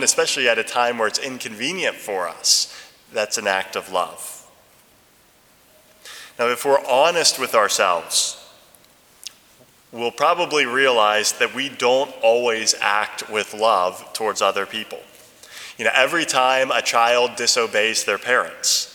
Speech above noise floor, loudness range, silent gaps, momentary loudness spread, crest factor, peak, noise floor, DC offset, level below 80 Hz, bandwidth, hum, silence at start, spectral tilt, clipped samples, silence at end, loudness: 35 dB; 5 LU; none; 17 LU; 20 dB; 0 dBFS; -55 dBFS; under 0.1%; -70 dBFS; over 20 kHz; none; 0 s; -0.5 dB/octave; under 0.1%; 0 s; -19 LUFS